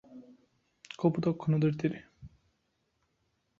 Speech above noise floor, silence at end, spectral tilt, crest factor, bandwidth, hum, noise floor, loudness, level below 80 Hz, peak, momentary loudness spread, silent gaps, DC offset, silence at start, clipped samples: 49 dB; 1.35 s; -8.5 dB/octave; 20 dB; 7.2 kHz; none; -78 dBFS; -31 LUFS; -66 dBFS; -14 dBFS; 14 LU; none; under 0.1%; 0.1 s; under 0.1%